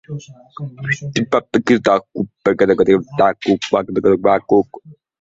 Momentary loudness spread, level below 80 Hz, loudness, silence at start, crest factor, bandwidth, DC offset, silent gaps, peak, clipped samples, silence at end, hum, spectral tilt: 14 LU; -52 dBFS; -16 LUFS; 0.1 s; 16 dB; 7.8 kHz; under 0.1%; none; -2 dBFS; under 0.1%; 0.3 s; none; -6 dB/octave